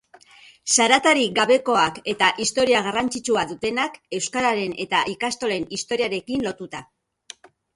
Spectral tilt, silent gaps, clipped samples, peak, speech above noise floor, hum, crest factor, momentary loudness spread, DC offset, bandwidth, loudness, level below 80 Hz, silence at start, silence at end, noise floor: -2 dB/octave; none; under 0.1%; -2 dBFS; 29 dB; none; 20 dB; 10 LU; under 0.1%; 11.5 kHz; -21 LUFS; -58 dBFS; 0.65 s; 0.9 s; -50 dBFS